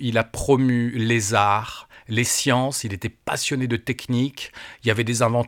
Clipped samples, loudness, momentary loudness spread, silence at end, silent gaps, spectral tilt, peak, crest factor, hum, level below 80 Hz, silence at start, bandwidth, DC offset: under 0.1%; -22 LUFS; 11 LU; 0 s; none; -4.5 dB/octave; -2 dBFS; 20 dB; none; -46 dBFS; 0 s; 17.5 kHz; under 0.1%